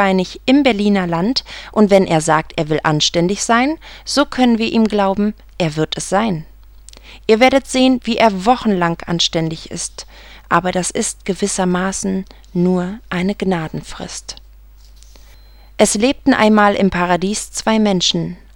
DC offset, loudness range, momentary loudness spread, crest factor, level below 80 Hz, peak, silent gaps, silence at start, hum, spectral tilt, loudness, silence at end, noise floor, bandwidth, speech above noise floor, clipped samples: under 0.1%; 5 LU; 12 LU; 16 dB; -40 dBFS; 0 dBFS; none; 0 s; none; -4.5 dB/octave; -16 LUFS; 0.2 s; -42 dBFS; 16.5 kHz; 26 dB; under 0.1%